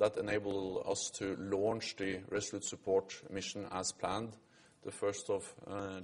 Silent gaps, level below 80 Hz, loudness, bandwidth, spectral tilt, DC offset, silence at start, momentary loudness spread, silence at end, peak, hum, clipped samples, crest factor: none; -68 dBFS; -38 LUFS; 11.5 kHz; -3.5 dB/octave; under 0.1%; 0 s; 8 LU; 0 s; -18 dBFS; none; under 0.1%; 20 dB